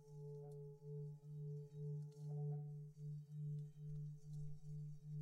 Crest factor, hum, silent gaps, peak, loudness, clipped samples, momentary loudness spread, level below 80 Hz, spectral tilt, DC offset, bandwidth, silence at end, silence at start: 12 dB; none; none; -40 dBFS; -52 LUFS; under 0.1%; 6 LU; -72 dBFS; -10.5 dB/octave; under 0.1%; 7 kHz; 0 s; 0 s